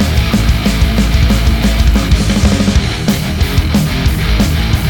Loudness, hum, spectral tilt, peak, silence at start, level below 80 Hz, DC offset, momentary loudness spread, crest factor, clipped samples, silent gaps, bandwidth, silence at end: -12 LUFS; none; -5.5 dB/octave; 0 dBFS; 0 s; -14 dBFS; under 0.1%; 3 LU; 10 dB; under 0.1%; none; 19 kHz; 0 s